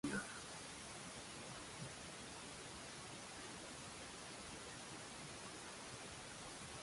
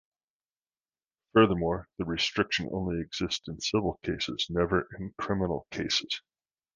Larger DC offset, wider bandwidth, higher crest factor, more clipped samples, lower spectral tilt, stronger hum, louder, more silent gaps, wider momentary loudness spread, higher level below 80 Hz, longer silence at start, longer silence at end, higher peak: neither; first, 11.5 kHz vs 9.8 kHz; about the same, 20 dB vs 22 dB; neither; second, -2.5 dB/octave vs -4.5 dB/octave; neither; second, -51 LUFS vs -29 LUFS; neither; second, 1 LU vs 10 LU; second, -70 dBFS vs -50 dBFS; second, 0.05 s vs 1.35 s; second, 0 s vs 0.55 s; second, -32 dBFS vs -8 dBFS